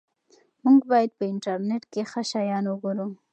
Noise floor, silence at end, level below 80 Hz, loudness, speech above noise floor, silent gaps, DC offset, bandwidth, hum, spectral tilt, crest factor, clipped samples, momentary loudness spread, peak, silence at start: -62 dBFS; 0.2 s; -82 dBFS; -25 LUFS; 38 dB; none; under 0.1%; 8.8 kHz; none; -6 dB/octave; 16 dB; under 0.1%; 11 LU; -8 dBFS; 0.65 s